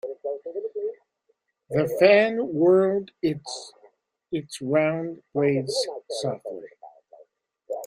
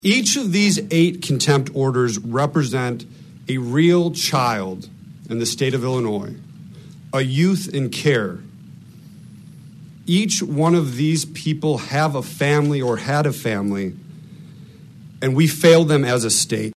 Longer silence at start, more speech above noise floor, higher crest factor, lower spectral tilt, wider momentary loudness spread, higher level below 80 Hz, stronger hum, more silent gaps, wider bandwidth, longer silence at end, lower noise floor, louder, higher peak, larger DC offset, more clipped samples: about the same, 0.05 s vs 0.05 s; first, 49 dB vs 23 dB; about the same, 22 dB vs 20 dB; about the same, -5.5 dB/octave vs -5 dB/octave; first, 17 LU vs 11 LU; second, -70 dBFS vs -62 dBFS; neither; neither; first, 16 kHz vs 14 kHz; about the same, 0 s vs 0.05 s; first, -72 dBFS vs -41 dBFS; second, -24 LUFS vs -19 LUFS; second, -4 dBFS vs 0 dBFS; neither; neither